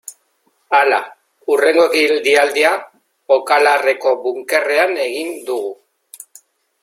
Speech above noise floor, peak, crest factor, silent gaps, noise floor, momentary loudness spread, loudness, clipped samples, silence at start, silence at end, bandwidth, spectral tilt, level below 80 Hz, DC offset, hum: 48 dB; 0 dBFS; 16 dB; none; -62 dBFS; 11 LU; -15 LUFS; under 0.1%; 0.1 s; 1.1 s; 16 kHz; -1 dB/octave; -70 dBFS; under 0.1%; none